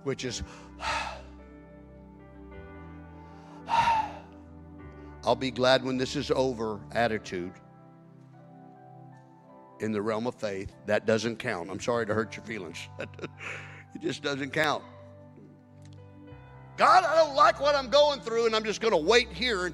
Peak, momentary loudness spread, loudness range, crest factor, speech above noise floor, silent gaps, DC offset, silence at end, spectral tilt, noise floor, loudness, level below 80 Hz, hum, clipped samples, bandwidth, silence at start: -6 dBFS; 25 LU; 12 LU; 24 dB; 25 dB; none; under 0.1%; 0 s; -4 dB/octave; -53 dBFS; -27 LUFS; -54 dBFS; none; under 0.1%; 14 kHz; 0.05 s